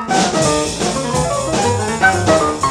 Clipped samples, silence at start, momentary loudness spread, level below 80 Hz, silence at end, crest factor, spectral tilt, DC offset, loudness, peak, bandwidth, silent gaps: under 0.1%; 0 s; 4 LU; -36 dBFS; 0 s; 14 dB; -4 dB/octave; under 0.1%; -15 LUFS; -2 dBFS; 16 kHz; none